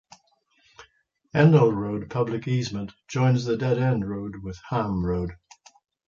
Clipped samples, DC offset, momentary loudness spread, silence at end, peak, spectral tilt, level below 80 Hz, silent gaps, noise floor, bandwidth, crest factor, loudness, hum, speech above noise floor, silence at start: under 0.1%; under 0.1%; 14 LU; 0.75 s; -6 dBFS; -7.5 dB/octave; -48 dBFS; none; -65 dBFS; 7.4 kHz; 20 dB; -24 LUFS; none; 42 dB; 0.8 s